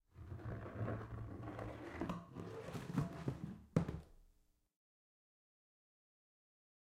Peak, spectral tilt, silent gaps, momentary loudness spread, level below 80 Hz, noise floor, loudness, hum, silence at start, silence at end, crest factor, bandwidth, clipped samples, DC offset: -22 dBFS; -8 dB/octave; none; 10 LU; -62 dBFS; -75 dBFS; -46 LUFS; none; 0.15 s; 2.6 s; 26 dB; 15.5 kHz; under 0.1%; under 0.1%